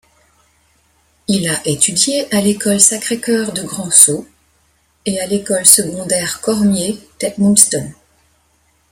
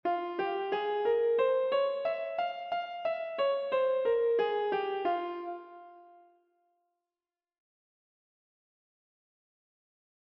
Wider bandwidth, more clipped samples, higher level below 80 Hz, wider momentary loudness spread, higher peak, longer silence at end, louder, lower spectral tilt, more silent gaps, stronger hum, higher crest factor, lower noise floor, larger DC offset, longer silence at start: first, over 20 kHz vs 5.6 kHz; first, 0.3% vs under 0.1%; first, -52 dBFS vs -80 dBFS; first, 14 LU vs 8 LU; first, 0 dBFS vs -18 dBFS; second, 1 s vs 4.35 s; first, -12 LUFS vs -31 LUFS; second, -3 dB/octave vs -5.5 dB/octave; neither; neither; about the same, 16 dB vs 16 dB; second, -58 dBFS vs under -90 dBFS; neither; first, 1.3 s vs 0.05 s